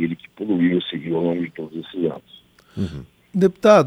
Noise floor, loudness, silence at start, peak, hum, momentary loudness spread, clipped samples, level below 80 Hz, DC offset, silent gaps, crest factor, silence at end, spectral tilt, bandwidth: -50 dBFS; -22 LUFS; 0 s; -2 dBFS; none; 14 LU; under 0.1%; -52 dBFS; under 0.1%; none; 20 dB; 0 s; -7 dB/octave; 13.5 kHz